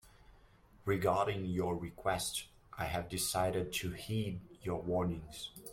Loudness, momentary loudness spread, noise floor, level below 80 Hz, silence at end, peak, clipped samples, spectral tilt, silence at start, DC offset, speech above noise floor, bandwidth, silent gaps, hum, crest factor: -37 LUFS; 11 LU; -63 dBFS; -58 dBFS; 0 s; -18 dBFS; under 0.1%; -4.5 dB/octave; 0.05 s; under 0.1%; 26 dB; 16.5 kHz; none; none; 20 dB